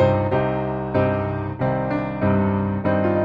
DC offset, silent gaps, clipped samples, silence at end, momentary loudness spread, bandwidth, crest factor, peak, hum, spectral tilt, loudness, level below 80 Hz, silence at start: under 0.1%; none; under 0.1%; 0 s; 5 LU; 5.2 kHz; 14 dB; -6 dBFS; none; -10.5 dB/octave; -22 LUFS; -44 dBFS; 0 s